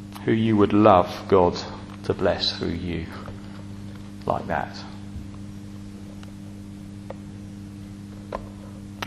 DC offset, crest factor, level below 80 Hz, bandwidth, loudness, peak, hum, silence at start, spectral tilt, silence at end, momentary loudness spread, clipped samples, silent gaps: under 0.1%; 26 dB; -48 dBFS; 13 kHz; -23 LUFS; 0 dBFS; none; 0 s; -6.5 dB/octave; 0 s; 20 LU; under 0.1%; none